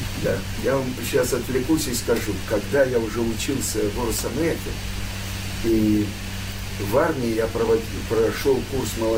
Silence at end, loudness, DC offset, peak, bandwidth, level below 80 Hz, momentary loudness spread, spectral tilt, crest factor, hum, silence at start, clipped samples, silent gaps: 0 s; -23 LUFS; under 0.1%; -6 dBFS; 16.5 kHz; -36 dBFS; 9 LU; -5 dB/octave; 16 dB; none; 0 s; under 0.1%; none